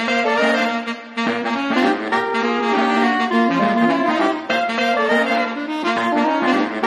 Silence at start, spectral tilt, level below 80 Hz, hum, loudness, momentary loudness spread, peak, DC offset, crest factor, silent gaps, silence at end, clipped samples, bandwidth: 0 s; -4.5 dB/octave; -64 dBFS; none; -18 LUFS; 5 LU; -4 dBFS; under 0.1%; 14 dB; none; 0 s; under 0.1%; 12 kHz